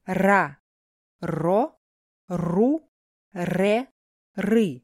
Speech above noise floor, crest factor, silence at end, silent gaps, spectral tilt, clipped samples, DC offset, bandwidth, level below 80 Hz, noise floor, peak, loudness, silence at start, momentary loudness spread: over 68 dB; 20 dB; 0.05 s; 0.60-1.19 s, 1.77-2.28 s, 2.88-3.31 s, 3.91-4.34 s; -7 dB/octave; under 0.1%; under 0.1%; 15 kHz; -58 dBFS; under -90 dBFS; -6 dBFS; -24 LUFS; 0.05 s; 14 LU